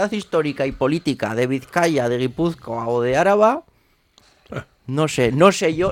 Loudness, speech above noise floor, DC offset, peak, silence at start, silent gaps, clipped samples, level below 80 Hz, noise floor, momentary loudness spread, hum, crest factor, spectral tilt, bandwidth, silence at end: -19 LUFS; 40 dB; under 0.1%; 0 dBFS; 0 s; none; under 0.1%; -48 dBFS; -59 dBFS; 13 LU; none; 20 dB; -5.5 dB/octave; 16.5 kHz; 0 s